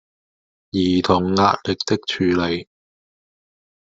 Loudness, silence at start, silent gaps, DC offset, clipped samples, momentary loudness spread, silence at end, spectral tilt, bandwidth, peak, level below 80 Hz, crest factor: -19 LUFS; 0.75 s; none; under 0.1%; under 0.1%; 7 LU; 1.3 s; -5.5 dB/octave; 7.8 kHz; -2 dBFS; -58 dBFS; 20 dB